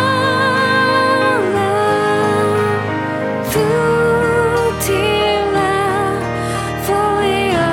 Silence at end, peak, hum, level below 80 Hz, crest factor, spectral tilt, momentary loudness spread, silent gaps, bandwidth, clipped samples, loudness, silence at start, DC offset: 0 s; -2 dBFS; none; -40 dBFS; 12 dB; -5 dB/octave; 6 LU; none; 17 kHz; under 0.1%; -15 LUFS; 0 s; under 0.1%